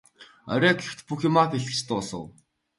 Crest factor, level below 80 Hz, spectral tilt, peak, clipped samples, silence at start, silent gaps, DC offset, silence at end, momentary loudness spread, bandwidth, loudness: 20 dB; -62 dBFS; -5 dB/octave; -6 dBFS; under 0.1%; 0.2 s; none; under 0.1%; 0.5 s; 16 LU; 11.5 kHz; -25 LUFS